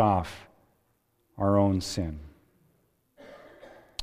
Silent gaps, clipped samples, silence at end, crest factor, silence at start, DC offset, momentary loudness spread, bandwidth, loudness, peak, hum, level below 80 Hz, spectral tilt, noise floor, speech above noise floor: none; under 0.1%; 0 s; 22 dB; 0 s; under 0.1%; 26 LU; 15.5 kHz; -28 LUFS; -10 dBFS; none; -50 dBFS; -6.5 dB/octave; -72 dBFS; 46 dB